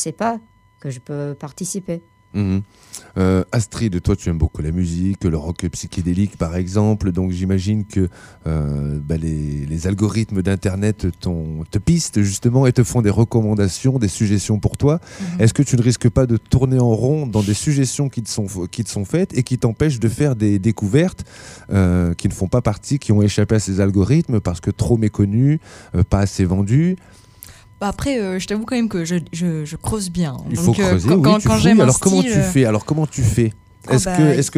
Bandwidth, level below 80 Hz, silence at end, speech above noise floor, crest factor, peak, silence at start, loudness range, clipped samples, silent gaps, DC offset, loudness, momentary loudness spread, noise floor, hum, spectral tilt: 15.5 kHz; -36 dBFS; 0 s; 25 dB; 16 dB; 0 dBFS; 0 s; 6 LU; under 0.1%; none; under 0.1%; -18 LUFS; 10 LU; -42 dBFS; none; -6.5 dB/octave